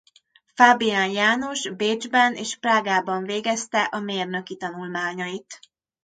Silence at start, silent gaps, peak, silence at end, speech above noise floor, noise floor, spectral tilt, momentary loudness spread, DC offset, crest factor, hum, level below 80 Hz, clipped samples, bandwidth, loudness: 0.55 s; none; 0 dBFS; 0.5 s; 36 dB; -59 dBFS; -3 dB/octave; 14 LU; under 0.1%; 22 dB; none; -72 dBFS; under 0.1%; 9.4 kHz; -22 LUFS